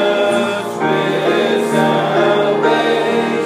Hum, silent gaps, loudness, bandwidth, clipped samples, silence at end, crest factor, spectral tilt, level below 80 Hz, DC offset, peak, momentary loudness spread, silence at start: none; none; -15 LUFS; 15.5 kHz; under 0.1%; 0 s; 14 dB; -5 dB/octave; -70 dBFS; under 0.1%; 0 dBFS; 3 LU; 0 s